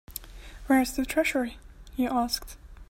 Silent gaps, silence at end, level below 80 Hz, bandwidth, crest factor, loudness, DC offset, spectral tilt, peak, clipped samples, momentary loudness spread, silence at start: none; 0.05 s; -46 dBFS; 16.5 kHz; 18 dB; -27 LUFS; under 0.1%; -3.5 dB/octave; -12 dBFS; under 0.1%; 20 LU; 0.1 s